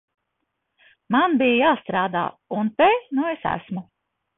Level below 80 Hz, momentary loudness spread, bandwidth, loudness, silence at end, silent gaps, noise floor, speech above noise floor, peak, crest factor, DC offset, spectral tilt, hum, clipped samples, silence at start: -60 dBFS; 10 LU; 4 kHz; -21 LUFS; 0.55 s; none; -77 dBFS; 56 dB; -6 dBFS; 16 dB; under 0.1%; -10 dB/octave; none; under 0.1%; 1.1 s